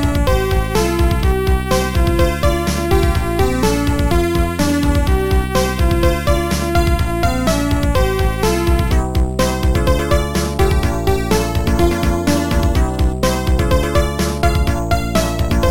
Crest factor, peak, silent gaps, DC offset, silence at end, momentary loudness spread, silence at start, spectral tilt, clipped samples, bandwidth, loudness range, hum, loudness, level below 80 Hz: 14 dB; -2 dBFS; none; 3%; 0 s; 2 LU; 0 s; -5.5 dB/octave; under 0.1%; 17 kHz; 1 LU; none; -16 LUFS; -18 dBFS